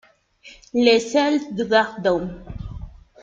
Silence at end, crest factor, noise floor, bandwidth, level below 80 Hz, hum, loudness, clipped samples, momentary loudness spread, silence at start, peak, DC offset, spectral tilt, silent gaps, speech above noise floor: 0.3 s; 20 dB; -49 dBFS; 7.8 kHz; -44 dBFS; none; -20 LUFS; under 0.1%; 19 LU; 0.45 s; -2 dBFS; under 0.1%; -4.5 dB/octave; none; 30 dB